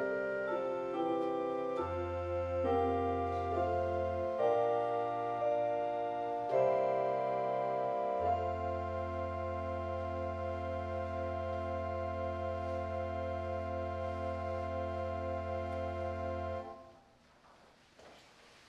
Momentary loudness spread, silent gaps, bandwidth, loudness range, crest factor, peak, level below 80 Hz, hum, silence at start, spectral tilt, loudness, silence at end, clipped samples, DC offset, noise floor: 6 LU; none; 9.2 kHz; 5 LU; 16 dB; -20 dBFS; -50 dBFS; none; 0 s; -8 dB/octave; -36 LUFS; 0.15 s; under 0.1%; under 0.1%; -64 dBFS